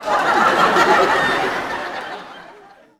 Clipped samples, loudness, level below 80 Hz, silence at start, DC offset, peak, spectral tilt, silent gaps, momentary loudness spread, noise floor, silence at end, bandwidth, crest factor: under 0.1%; -16 LUFS; -52 dBFS; 0 s; under 0.1%; -2 dBFS; -3.5 dB/octave; none; 17 LU; -45 dBFS; 0.5 s; 17.5 kHz; 16 dB